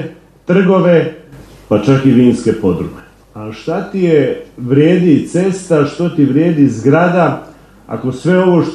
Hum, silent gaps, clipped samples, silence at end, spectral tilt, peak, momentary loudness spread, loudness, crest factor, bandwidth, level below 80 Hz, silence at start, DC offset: none; none; under 0.1%; 0 s; -8 dB/octave; 0 dBFS; 14 LU; -12 LUFS; 12 dB; 11 kHz; -46 dBFS; 0 s; under 0.1%